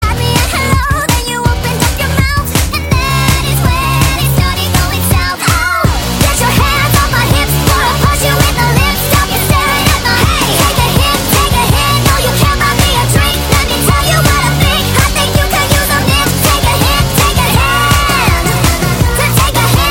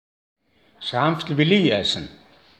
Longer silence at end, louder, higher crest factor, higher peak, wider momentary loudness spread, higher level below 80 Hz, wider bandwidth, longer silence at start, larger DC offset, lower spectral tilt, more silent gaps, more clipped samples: second, 0 s vs 0.45 s; first, -10 LUFS vs -20 LUFS; second, 10 dB vs 20 dB; first, 0 dBFS vs -4 dBFS; second, 3 LU vs 13 LU; first, -18 dBFS vs -58 dBFS; first, 17.5 kHz vs 9.4 kHz; second, 0 s vs 0.8 s; neither; second, -4 dB/octave vs -5.5 dB/octave; neither; neither